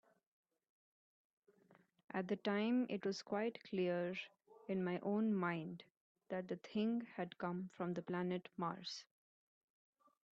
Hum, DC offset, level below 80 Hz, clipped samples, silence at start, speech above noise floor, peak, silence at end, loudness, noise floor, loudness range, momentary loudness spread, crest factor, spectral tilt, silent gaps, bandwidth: none; under 0.1%; -86 dBFS; under 0.1%; 2.15 s; 31 dB; -26 dBFS; 1.3 s; -42 LUFS; -72 dBFS; 4 LU; 10 LU; 18 dB; -6.5 dB/octave; 5.90-6.15 s; 7.8 kHz